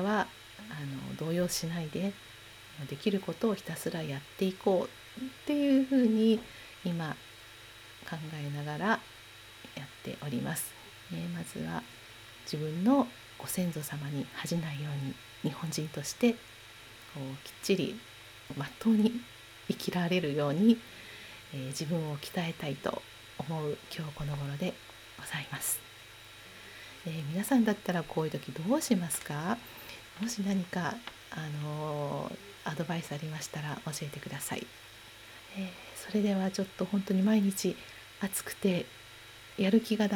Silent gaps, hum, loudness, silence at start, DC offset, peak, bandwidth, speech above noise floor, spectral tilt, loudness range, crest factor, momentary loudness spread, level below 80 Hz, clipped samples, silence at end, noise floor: none; none; -33 LUFS; 0 s; under 0.1%; -12 dBFS; 20 kHz; 19 dB; -5 dB/octave; 7 LU; 20 dB; 20 LU; -64 dBFS; under 0.1%; 0 s; -52 dBFS